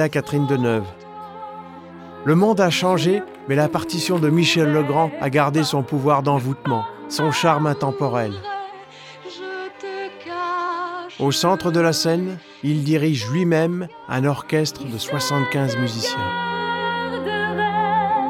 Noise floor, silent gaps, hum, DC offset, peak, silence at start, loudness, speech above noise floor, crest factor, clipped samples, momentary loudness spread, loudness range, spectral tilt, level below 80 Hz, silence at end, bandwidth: -40 dBFS; none; none; under 0.1%; -4 dBFS; 0 s; -20 LUFS; 21 dB; 18 dB; under 0.1%; 14 LU; 5 LU; -5.5 dB/octave; -62 dBFS; 0 s; 16.5 kHz